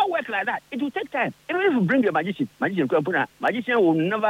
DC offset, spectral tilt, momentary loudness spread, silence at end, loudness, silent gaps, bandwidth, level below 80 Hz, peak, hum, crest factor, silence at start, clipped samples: under 0.1%; -7.5 dB/octave; 8 LU; 0 s; -23 LUFS; none; 15.5 kHz; -70 dBFS; -10 dBFS; none; 12 dB; 0 s; under 0.1%